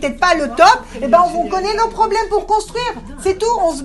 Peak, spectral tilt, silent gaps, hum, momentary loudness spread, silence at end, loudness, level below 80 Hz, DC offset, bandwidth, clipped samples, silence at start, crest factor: 0 dBFS; -3 dB/octave; none; none; 10 LU; 0 s; -15 LUFS; -36 dBFS; under 0.1%; 12 kHz; 0.1%; 0 s; 16 dB